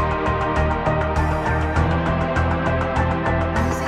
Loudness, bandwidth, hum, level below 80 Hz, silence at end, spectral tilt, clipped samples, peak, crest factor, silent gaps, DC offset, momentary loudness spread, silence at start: -21 LUFS; 12 kHz; none; -28 dBFS; 0 s; -7 dB/octave; under 0.1%; -6 dBFS; 14 dB; none; under 0.1%; 1 LU; 0 s